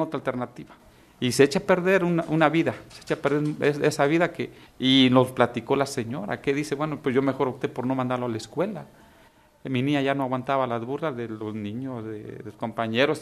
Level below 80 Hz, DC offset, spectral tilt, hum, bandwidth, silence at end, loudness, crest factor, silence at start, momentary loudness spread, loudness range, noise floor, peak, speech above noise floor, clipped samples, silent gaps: -62 dBFS; under 0.1%; -5.5 dB/octave; none; 14 kHz; 0 s; -25 LUFS; 22 dB; 0 s; 13 LU; 6 LU; -56 dBFS; -4 dBFS; 31 dB; under 0.1%; none